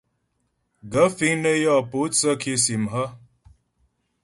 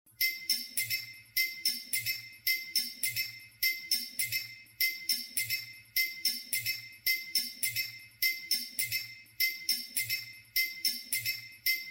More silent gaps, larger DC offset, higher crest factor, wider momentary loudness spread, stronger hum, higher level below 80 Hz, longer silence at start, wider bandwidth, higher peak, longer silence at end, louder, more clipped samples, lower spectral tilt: neither; neither; about the same, 20 dB vs 20 dB; about the same, 8 LU vs 6 LU; neither; first, -60 dBFS vs -78 dBFS; first, 0.85 s vs 0.2 s; second, 12 kHz vs 16.5 kHz; first, -4 dBFS vs -14 dBFS; first, 1.05 s vs 0 s; first, -21 LUFS vs -31 LUFS; neither; first, -3.5 dB/octave vs 1.5 dB/octave